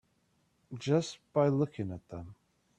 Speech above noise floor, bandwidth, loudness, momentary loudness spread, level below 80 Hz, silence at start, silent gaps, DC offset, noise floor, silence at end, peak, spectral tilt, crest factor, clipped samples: 41 dB; 10 kHz; -32 LUFS; 18 LU; -68 dBFS; 0.7 s; none; under 0.1%; -73 dBFS; 0.45 s; -14 dBFS; -7 dB/octave; 20 dB; under 0.1%